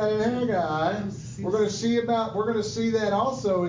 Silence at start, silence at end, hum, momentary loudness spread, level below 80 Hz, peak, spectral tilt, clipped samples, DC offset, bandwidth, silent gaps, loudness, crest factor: 0 s; 0 s; none; 4 LU; -54 dBFS; -12 dBFS; -5.5 dB/octave; under 0.1%; under 0.1%; 7.6 kHz; none; -26 LUFS; 12 dB